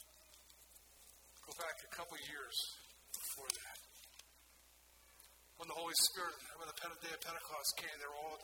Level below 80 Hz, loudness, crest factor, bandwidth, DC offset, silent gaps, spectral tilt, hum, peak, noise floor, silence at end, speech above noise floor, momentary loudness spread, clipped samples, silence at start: -76 dBFS; -42 LUFS; 26 dB; 19 kHz; under 0.1%; none; 0.5 dB/octave; none; -20 dBFS; -67 dBFS; 0 s; 23 dB; 24 LU; under 0.1%; 0 s